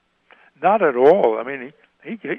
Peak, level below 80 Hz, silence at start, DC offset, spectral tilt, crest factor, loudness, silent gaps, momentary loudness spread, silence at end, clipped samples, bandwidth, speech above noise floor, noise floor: -2 dBFS; -70 dBFS; 0.6 s; under 0.1%; -8 dB/octave; 18 dB; -17 LUFS; none; 19 LU; 0 s; under 0.1%; 5 kHz; 36 dB; -54 dBFS